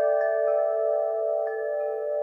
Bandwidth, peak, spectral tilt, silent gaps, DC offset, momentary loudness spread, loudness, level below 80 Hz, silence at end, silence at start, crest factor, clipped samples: 2.6 kHz; -14 dBFS; -4.5 dB/octave; none; under 0.1%; 5 LU; -26 LUFS; under -90 dBFS; 0 s; 0 s; 12 dB; under 0.1%